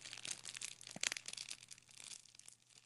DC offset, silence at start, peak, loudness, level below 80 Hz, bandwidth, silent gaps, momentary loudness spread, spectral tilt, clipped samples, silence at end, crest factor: under 0.1%; 0 s; -14 dBFS; -46 LUFS; -90 dBFS; 15 kHz; none; 17 LU; 1 dB/octave; under 0.1%; 0 s; 36 dB